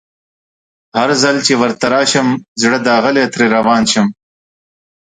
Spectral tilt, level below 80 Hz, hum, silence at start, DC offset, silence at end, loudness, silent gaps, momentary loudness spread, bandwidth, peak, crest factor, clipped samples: -3.5 dB/octave; -56 dBFS; none; 0.95 s; under 0.1%; 0.9 s; -12 LUFS; 2.48-2.56 s; 5 LU; 9.6 kHz; 0 dBFS; 14 dB; under 0.1%